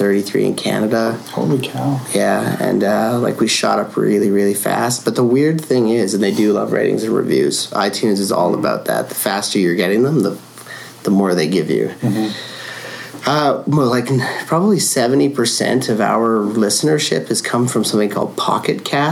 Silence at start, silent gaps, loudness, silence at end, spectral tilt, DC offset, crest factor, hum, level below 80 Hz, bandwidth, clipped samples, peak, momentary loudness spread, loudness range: 0 s; none; -16 LUFS; 0 s; -4.5 dB/octave; under 0.1%; 14 dB; none; -64 dBFS; 18 kHz; under 0.1%; -2 dBFS; 5 LU; 3 LU